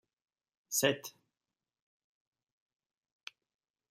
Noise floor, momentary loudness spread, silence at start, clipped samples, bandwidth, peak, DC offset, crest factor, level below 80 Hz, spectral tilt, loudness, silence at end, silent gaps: under -90 dBFS; 21 LU; 0.7 s; under 0.1%; 15 kHz; -14 dBFS; under 0.1%; 28 dB; -86 dBFS; -2.5 dB/octave; -33 LUFS; 2.8 s; none